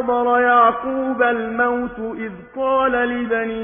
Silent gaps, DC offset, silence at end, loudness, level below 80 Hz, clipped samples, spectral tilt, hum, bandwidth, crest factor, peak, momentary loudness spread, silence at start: none; under 0.1%; 0 s; -18 LUFS; -50 dBFS; under 0.1%; -9 dB/octave; none; 3.6 kHz; 16 dB; -2 dBFS; 13 LU; 0 s